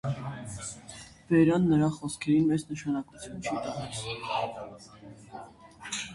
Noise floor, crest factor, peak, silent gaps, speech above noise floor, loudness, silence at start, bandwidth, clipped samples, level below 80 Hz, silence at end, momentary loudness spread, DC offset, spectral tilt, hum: -48 dBFS; 18 dB; -12 dBFS; none; 20 dB; -29 LUFS; 0.05 s; 11.5 kHz; under 0.1%; -58 dBFS; 0 s; 22 LU; under 0.1%; -6 dB/octave; none